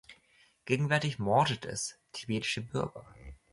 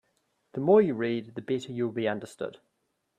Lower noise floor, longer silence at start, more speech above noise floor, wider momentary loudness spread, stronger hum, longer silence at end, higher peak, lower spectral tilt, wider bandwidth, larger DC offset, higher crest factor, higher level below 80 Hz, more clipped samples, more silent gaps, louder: second, -66 dBFS vs -74 dBFS; second, 0.1 s vs 0.55 s; second, 34 dB vs 47 dB; about the same, 18 LU vs 17 LU; neither; second, 0.2 s vs 0.65 s; second, -14 dBFS vs -10 dBFS; second, -4.5 dB/octave vs -7 dB/octave; about the same, 11.5 kHz vs 10.5 kHz; neither; about the same, 20 dB vs 20 dB; first, -58 dBFS vs -74 dBFS; neither; neither; second, -32 LUFS vs -28 LUFS